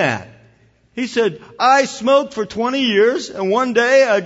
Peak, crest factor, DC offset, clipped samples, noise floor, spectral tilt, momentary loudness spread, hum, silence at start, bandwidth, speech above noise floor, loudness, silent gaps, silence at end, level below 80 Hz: -2 dBFS; 16 dB; under 0.1%; under 0.1%; -53 dBFS; -4 dB/octave; 10 LU; none; 0 s; 8 kHz; 38 dB; -16 LUFS; none; 0 s; -60 dBFS